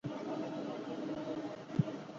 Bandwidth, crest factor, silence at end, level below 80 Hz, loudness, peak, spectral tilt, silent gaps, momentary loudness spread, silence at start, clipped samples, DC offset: 7.6 kHz; 22 dB; 0 s; -72 dBFS; -40 LUFS; -18 dBFS; -7 dB/octave; none; 5 LU; 0.05 s; under 0.1%; under 0.1%